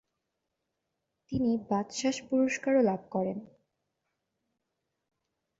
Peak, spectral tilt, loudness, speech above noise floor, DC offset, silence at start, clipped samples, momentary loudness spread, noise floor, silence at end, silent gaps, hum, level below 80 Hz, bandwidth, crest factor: -14 dBFS; -5 dB/octave; -30 LUFS; 55 dB; under 0.1%; 1.3 s; under 0.1%; 9 LU; -84 dBFS; 2.15 s; none; none; -66 dBFS; 8 kHz; 18 dB